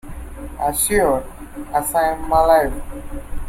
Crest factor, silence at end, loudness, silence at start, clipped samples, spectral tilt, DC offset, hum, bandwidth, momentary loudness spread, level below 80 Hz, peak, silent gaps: 16 dB; 0 s; -18 LUFS; 0.05 s; under 0.1%; -4 dB/octave; under 0.1%; none; 16.5 kHz; 20 LU; -32 dBFS; -4 dBFS; none